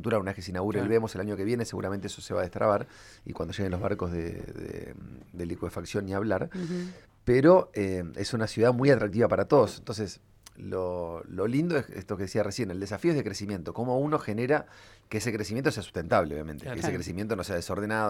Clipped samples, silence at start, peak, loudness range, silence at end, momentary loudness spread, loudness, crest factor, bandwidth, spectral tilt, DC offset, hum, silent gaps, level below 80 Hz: under 0.1%; 0 s; -6 dBFS; 8 LU; 0 s; 14 LU; -29 LUFS; 22 dB; 16 kHz; -6.5 dB/octave; under 0.1%; none; none; -54 dBFS